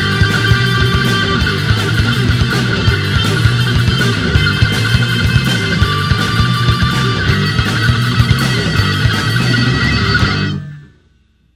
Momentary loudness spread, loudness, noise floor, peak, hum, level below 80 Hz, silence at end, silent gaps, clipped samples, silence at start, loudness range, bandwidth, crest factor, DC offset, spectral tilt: 2 LU; -13 LUFS; -52 dBFS; 0 dBFS; none; -24 dBFS; 0.7 s; none; under 0.1%; 0 s; 0 LU; 15.5 kHz; 12 dB; under 0.1%; -5 dB/octave